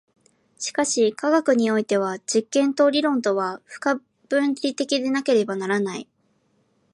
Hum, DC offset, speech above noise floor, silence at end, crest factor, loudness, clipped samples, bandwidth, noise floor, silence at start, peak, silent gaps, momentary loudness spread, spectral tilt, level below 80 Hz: none; under 0.1%; 44 dB; 0.9 s; 16 dB; -22 LUFS; under 0.1%; 11.5 kHz; -66 dBFS; 0.6 s; -8 dBFS; none; 9 LU; -3.5 dB/octave; -76 dBFS